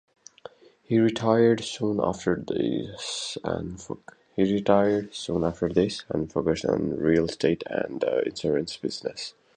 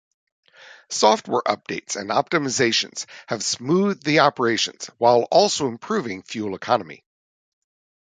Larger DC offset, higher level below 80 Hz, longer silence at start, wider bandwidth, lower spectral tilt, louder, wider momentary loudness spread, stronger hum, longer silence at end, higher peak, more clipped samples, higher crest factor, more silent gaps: neither; first, -52 dBFS vs -66 dBFS; first, 0.9 s vs 0.7 s; about the same, 9.6 kHz vs 9.6 kHz; first, -5.5 dB/octave vs -3.5 dB/octave; second, -26 LUFS vs -21 LUFS; about the same, 11 LU vs 11 LU; neither; second, 0.25 s vs 1.1 s; second, -6 dBFS vs -2 dBFS; neither; about the same, 20 dB vs 20 dB; neither